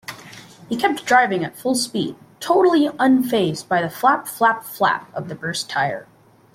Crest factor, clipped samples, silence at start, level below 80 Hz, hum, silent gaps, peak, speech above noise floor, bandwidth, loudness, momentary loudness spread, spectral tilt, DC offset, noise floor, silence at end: 16 dB; under 0.1%; 0.1 s; -62 dBFS; none; none; -4 dBFS; 23 dB; 16.5 kHz; -19 LUFS; 13 LU; -4 dB/octave; under 0.1%; -42 dBFS; 0.5 s